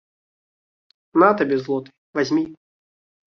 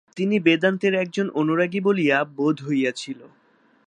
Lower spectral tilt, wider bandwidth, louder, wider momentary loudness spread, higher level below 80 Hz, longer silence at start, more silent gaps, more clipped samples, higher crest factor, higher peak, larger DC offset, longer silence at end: about the same, -6.5 dB/octave vs -6 dB/octave; second, 6.8 kHz vs 10 kHz; about the same, -20 LUFS vs -21 LUFS; first, 12 LU vs 7 LU; first, -66 dBFS vs -74 dBFS; first, 1.15 s vs 0.15 s; first, 1.98-2.13 s vs none; neither; about the same, 22 dB vs 18 dB; about the same, -2 dBFS vs -4 dBFS; neither; about the same, 0.75 s vs 0.65 s